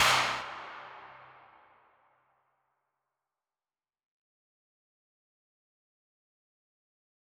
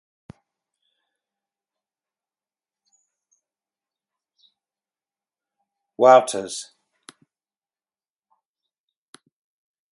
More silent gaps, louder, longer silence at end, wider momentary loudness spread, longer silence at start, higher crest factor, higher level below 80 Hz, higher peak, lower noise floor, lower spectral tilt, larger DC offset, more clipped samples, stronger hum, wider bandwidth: neither; second, -30 LUFS vs -17 LUFS; first, 6.15 s vs 3.3 s; first, 25 LU vs 21 LU; second, 0 s vs 6 s; about the same, 26 dB vs 26 dB; first, -70 dBFS vs -76 dBFS; second, -12 dBFS vs -2 dBFS; about the same, under -90 dBFS vs under -90 dBFS; second, -0.5 dB/octave vs -3.5 dB/octave; neither; neither; neither; first, over 20 kHz vs 11.5 kHz